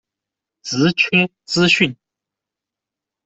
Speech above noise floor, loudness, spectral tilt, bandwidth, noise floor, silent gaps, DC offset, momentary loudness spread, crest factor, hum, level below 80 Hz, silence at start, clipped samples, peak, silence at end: 69 dB; -16 LUFS; -4.5 dB/octave; 8.2 kHz; -86 dBFS; none; under 0.1%; 9 LU; 18 dB; none; -58 dBFS; 0.65 s; under 0.1%; -2 dBFS; 1.35 s